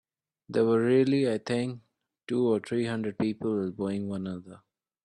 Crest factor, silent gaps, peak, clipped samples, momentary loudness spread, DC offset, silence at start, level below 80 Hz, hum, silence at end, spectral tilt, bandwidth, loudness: 16 dB; none; -12 dBFS; under 0.1%; 12 LU; under 0.1%; 0.5 s; -68 dBFS; none; 0.5 s; -7 dB/octave; 11 kHz; -28 LUFS